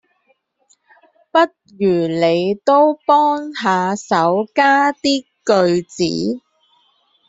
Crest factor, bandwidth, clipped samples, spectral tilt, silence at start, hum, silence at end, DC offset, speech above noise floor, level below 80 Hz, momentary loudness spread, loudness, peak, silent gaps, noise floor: 16 dB; 8 kHz; under 0.1%; -5 dB/octave; 1.35 s; none; 0.9 s; under 0.1%; 47 dB; -60 dBFS; 7 LU; -16 LUFS; -2 dBFS; none; -62 dBFS